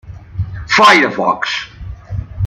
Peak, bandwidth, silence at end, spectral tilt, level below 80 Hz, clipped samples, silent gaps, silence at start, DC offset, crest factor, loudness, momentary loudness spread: 0 dBFS; 15.5 kHz; 0 s; -4 dB/octave; -34 dBFS; under 0.1%; none; 0.05 s; under 0.1%; 14 dB; -11 LUFS; 22 LU